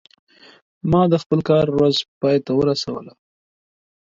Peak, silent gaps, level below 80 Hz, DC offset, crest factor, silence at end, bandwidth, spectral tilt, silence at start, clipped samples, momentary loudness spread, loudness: -2 dBFS; 1.26-1.30 s, 2.08-2.21 s; -48 dBFS; under 0.1%; 18 dB; 0.95 s; 7.8 kHz; -7 dB/octave; 0.85 s; under 0.1%; 11 LU; -19 LUFS